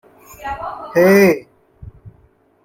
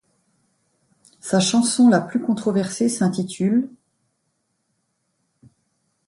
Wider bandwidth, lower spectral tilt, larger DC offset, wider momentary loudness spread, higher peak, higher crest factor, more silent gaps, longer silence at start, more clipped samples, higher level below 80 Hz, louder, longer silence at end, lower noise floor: first, 15.5 kHz vs 11.5 kHz; about the same, -6 dB/octave vs -5 dB/octave; neither; first, 18 LU vs 8 LU; about the same, -2 dBFS vs -4 dBFS; about the same, 16 dB vs 18 dB; neither; second, 0.4 s vs 1.25 s; neither; first, -48 dBFS vs -66 dBFS; first, -15 LUFS vs -20 LUFS; second, 0.55 s vs 2.4 s; second, -54 dBFS vs -72 dBFS